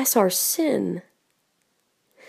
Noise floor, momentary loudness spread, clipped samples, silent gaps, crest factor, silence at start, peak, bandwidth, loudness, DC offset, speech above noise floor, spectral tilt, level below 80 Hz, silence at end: -70 dBFS; 11 LU; under 0.1%; none; 20 dB; 0 s; -6 dBFS; 15.5 kHz; -22 LUFS; under 0.1%; 48 dB; -3.5 dB/octave; -82 dBFS; 1.3 s